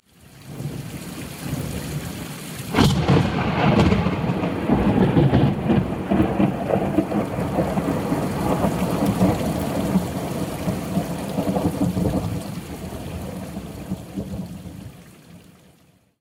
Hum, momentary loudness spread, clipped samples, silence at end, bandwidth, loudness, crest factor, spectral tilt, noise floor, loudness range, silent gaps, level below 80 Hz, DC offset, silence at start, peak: none; 15 LU; under 0.1%; 0.8 s; 16 kHz; -22 LUFS; 18 dB; -7 dB/octave; -56 dBFS; 10 LU; none; -38 dBFS; under 0.1%; 0.35 s; -4 dBFS